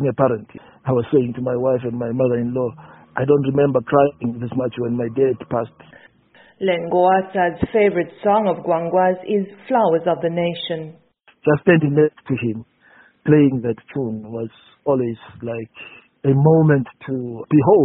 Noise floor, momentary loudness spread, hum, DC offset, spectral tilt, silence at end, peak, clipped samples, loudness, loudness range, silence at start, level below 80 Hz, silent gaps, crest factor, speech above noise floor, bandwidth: -52 dBFS; 14 LU; none; under 0.1%; -7 dB/octave; 0 s; 0 dBFS; under 0.1%; -19 LUFS; 3 LU; 0 s; -54 dBFS; none; 18 dB; 34 dB; 4 kHz